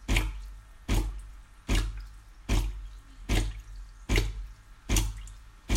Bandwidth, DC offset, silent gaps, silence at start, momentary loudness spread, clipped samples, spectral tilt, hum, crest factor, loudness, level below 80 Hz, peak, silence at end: 16 kHz; under 0.1%; none; 0 s; 19 LU; under 0.1%; -4 dB/octave; none; 22 dB; -32 LUFS; -32 dBFS; -10 dBFS; 0 s